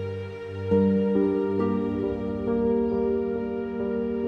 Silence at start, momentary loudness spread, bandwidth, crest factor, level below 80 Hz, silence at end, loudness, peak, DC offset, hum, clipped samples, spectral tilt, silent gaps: 0 s; 8 LU; 6 kHz; 16 dB; -50 dBFS; 0 s; -26 LUFS; -10 dBFS; under 0.1%; none; under 0.1%; -10 dB/octave; none